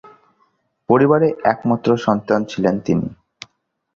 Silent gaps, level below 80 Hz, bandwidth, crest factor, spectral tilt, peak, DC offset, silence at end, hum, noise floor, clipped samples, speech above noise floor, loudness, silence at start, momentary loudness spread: none; -52 dBFS; 7.4 kHz; 16 dB; -7.5 dB/octave; -2 dBFS; under 0.1%; 0.8 s; none; -63 dBFS; under 0.1%; 47 dB; -17 LUFS; 0.9 s; 7 LU